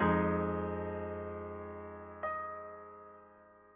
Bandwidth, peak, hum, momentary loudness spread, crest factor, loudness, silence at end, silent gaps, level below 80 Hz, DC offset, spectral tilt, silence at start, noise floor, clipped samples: 3.8 kHz; -20 dBFS; none; 20 LU; 18 dB; -38 LUFS; 0.05 s; none; -52 dBFS; under 0.1%; -7 dB/octave; 0 s; -60 dBFS; under 0.1%